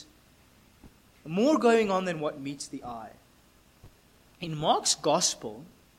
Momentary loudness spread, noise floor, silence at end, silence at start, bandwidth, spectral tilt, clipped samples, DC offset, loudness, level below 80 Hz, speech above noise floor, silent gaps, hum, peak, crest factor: 19 LU; -60 dBFS; 0.3 s; 0 s; 16.5 kHz; -3.5 dB/octave; under 0.1%; under 0.1%; -27 LUFS; -64 dBFS; 33 dB; none; none; -10 dBFS; 20 dB